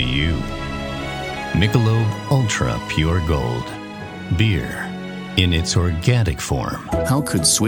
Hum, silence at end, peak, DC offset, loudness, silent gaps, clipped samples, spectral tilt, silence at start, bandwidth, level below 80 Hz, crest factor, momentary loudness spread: none; 0 s; 0 dBFS; under 0.1%; -20 LUFS; none; under 0.1%; -4.5 dB/octave; 0 s; 18 kHz; -32 dBFS; 18 dB; 10 LU